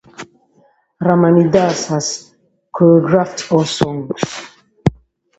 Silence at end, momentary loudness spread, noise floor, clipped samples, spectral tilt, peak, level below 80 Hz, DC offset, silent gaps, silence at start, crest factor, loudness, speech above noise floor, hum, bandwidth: 0.45 s; 17 LU; -55 dBFS; under 0.1%; -6 dB/octave; 0 dBFS; -46 dBFS; under 0.1%; none; 0.2 s; 16 dB; -15 LUFS; 42 dB; none; 8.2 kHz